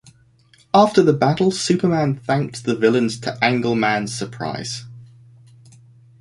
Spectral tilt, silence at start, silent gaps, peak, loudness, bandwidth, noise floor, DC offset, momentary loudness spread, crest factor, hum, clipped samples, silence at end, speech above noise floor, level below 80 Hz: -5.5 dB/octave; 0.75 s; none; -2 dBFS; -19 LUFS; 11.5 kHz; -54 dBFS; under 0.1%; 12 LU; 18 dB; none; under 0.1%; 1.15 s; 36 dB; -56 dBFS